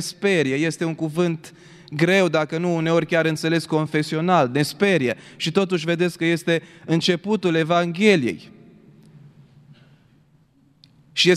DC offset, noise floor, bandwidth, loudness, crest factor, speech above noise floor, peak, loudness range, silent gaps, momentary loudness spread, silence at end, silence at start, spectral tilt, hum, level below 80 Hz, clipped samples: under 0.1%; -58 dBFS; 14.5 kHz; -21 LUFS; 18 dB; 37 dB; -4 dBFS; 3 LU; none; 7 LU; 0 s; 0 s; -5.5 dB/octave; none; -66 dBFS; under 0.1%